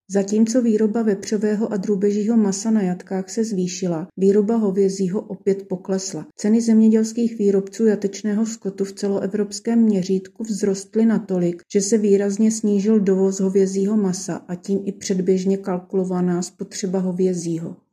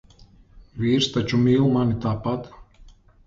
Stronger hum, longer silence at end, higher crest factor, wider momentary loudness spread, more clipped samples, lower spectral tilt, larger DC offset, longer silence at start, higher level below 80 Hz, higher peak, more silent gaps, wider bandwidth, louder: neither; second, 0.15 s vs 0.45 s; about the same, 14 dB vs 16 dB; second, 8 LU vs 13 LU; neither; about the same, -6.5 dB/octave vs -6.5 dB/octave; neither; second, 0.1 s vs 0.55 s; second, -72 dBFS vs -46 dBFS; about the same, -6 dBFS vs -8 dBFS; neither; first, 11 kHz vs 7.8 kHz; about the same, -20 LUFS vs -22 LUFS